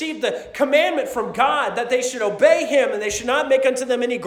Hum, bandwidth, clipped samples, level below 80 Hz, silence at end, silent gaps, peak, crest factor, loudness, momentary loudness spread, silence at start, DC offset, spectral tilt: none; 15.5 kHz; under 0.1%; -56 dBFS; 0 s; none; -2 dBFS; 16 dB; -19 LUFS; 7 LU; 0 s; under 0.1%; -2.5 dB/octave